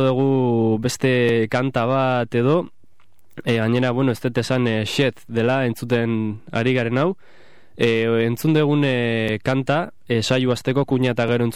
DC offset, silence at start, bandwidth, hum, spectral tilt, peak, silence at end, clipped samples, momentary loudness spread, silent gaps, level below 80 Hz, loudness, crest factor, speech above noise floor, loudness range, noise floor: 0.9%; 0 s; 15.5 kHz; none; -6.5 dB/octave; -6 dBFS; 0 s; under 0.1%; 5 LU; none; -54 dBFS; -20 LUFS; 14 dB; 42 dB; 2 LU; -62 dBFS